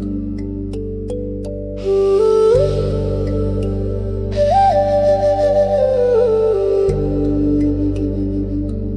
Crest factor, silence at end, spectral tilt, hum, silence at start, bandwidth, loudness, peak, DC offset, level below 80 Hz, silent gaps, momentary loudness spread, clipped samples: 12 dB; 0 s; -8.5 dB/octave; none; 0 s; 10.5 kHz; -17 LUFS; -4 dBFS; under 0.1%; -28 dBFS; none; 12 LU; under 0.1%